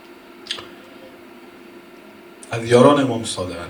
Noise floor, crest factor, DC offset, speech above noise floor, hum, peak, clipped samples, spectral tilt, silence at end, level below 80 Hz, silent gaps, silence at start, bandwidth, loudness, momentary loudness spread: -43 dBFS; 22 dB; under 0.1%; 26 dB; none; 0 dBFS; under 0.1%; -5.5 dB/octave; 0 s; -58 dBFS; none; 0.45 s; 19.5 kHz; -18 LUFS; 28 LU